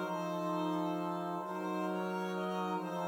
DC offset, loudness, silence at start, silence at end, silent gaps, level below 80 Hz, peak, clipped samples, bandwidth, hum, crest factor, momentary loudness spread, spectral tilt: under 0.1%; -37 LUFS; 0 s; 0 s; none; -84 dBFS; -24 dBFS; under 0.1%; 18.5 kHz; none; 12 dB; 3 LU; -6.5 dB/octave